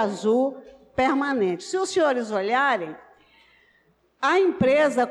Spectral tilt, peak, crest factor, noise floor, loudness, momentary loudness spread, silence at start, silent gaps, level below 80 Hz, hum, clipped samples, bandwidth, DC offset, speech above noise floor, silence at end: -4.5 dB/octave; -12 dBFS; 12 dB; -63 dBFS; -23 LUFS; 8 LU; 0 s; none; -60 dBFS; none; under 0.1%; 11.5 kHz; under 0.1%; 41 dB; 0 s